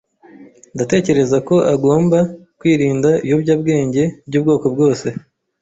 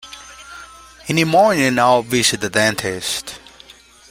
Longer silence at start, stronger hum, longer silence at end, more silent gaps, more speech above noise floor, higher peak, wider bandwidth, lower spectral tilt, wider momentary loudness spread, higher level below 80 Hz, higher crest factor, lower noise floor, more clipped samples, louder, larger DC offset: first, 0.4 s vs 0.05 s; neither; second, 0.45 s vs 0.75 s; neither; about the same, 28 dB vs 29 dB; about the same, -2 dBFS vs -2 dBFS; second, 8 kHz vs 16 kHz; first, -7 dB/octave vs -3.5 dB/octave; second, 8 LU vs 22 LU; about the same, -52 dBFS vs -52 dBFS; about the same, 14 dB vs 18 dB; about the same, -43 dBFS vs -45 dBFS; neither; about the same, -16 LUFS vs -16 LUFS; neither